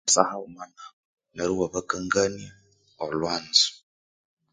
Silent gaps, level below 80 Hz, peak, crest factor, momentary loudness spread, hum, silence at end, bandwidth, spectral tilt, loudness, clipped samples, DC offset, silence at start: 0.93-1.17 s; -58 dBFS; 0 dBFS; 28 dB; 22 LU; none; 0.75 s; 10 kHz; -2 dB/octave; -24 LUFS; under 0.1%; under 0.1%; 0.05 s